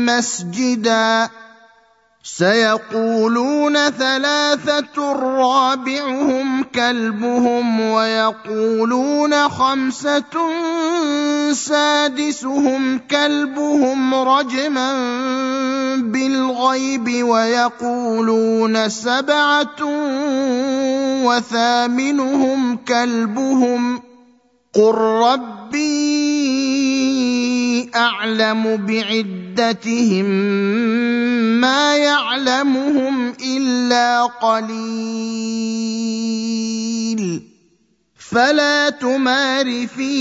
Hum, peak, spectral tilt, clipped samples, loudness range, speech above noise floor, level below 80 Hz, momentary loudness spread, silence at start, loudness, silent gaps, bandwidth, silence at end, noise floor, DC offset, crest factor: none; -2 dBFS; -3.5 dB/octave; under 0.1%; 2 LU; 43 dB; -66 dBFS; 6 LU; 0 s; -17 LUFS; none; 8 kHz; 0 s; -60 dBFS; under 0.1%; 16 dB